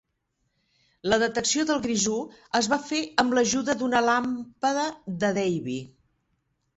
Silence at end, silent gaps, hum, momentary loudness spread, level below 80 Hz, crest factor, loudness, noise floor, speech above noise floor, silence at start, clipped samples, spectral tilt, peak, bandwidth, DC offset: 0.9 s; none; none; 8 LU; -60 dBFS; 22 dB; -25 LUFS; -76 dBFS; 51 dB; 1.05 s; under 0.1%; -3 dB/octave; -4 dBFS; 8.2 kHz; under 0.1%